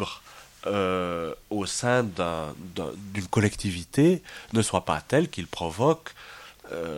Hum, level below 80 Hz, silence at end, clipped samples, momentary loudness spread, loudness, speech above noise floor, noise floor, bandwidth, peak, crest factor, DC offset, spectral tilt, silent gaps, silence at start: none; -52 dBFS; 0 s; under 0.1%; 13 LU; -27 LUFS; 22 dB; -48 dBFS; 17 kHz; -6 dBFS; 20 dB; under 0.1%; -5 dB/octave; none; 0 s